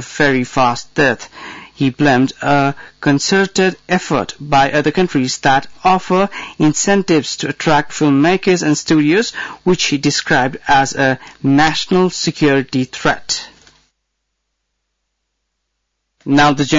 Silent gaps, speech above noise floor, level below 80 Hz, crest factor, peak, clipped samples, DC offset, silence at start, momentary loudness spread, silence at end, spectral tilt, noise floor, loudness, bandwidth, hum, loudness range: none; 58 dB; -44 dBFS; 12 dB; -4 dBFS; under 0.1%; under 0.1%; 0 s; 7 LU; 0 s; -4.5 dB/octave; -72 dBFS; -14 LUFS; 7.8 kHz; none; 6 LU